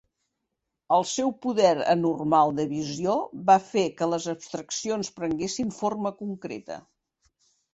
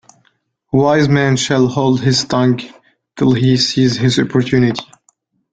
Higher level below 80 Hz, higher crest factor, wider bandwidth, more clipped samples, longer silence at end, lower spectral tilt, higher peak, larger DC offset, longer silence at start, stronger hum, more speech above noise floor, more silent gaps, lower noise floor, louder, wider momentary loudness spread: second, -64 dBFS vs -48 dBFS; first, 20 dB vs 14 dB; about the same, 8.4 kHz vs 9.2 kHz; neither; first, 0.95 s vs 0.7 s; about the same, -4.5 dB/octave vs -5.5 dB/octave; second, -6 dBFS vs -2 dBFS; neither; first, 0.9 s vs 0.75 s; neither; first, 57 dB vs 48 dB; neither; first, -82 dBFS vs -61 dBFS; second, -26 LUFS vs -14 LUFS; first, 13 LU vs 5 LU